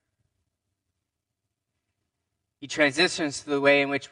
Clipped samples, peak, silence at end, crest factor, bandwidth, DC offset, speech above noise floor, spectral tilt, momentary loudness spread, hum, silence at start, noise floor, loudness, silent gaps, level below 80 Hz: under 0.1%; -6 dBFS; 0.05 s; 22 dB; 11 kHz; under 0.1%; 59 dB; -3.5 dB/octave; 9 LU; none; 2.6 s; -83 dBFS; -23 LUFS; none; -72 dBFS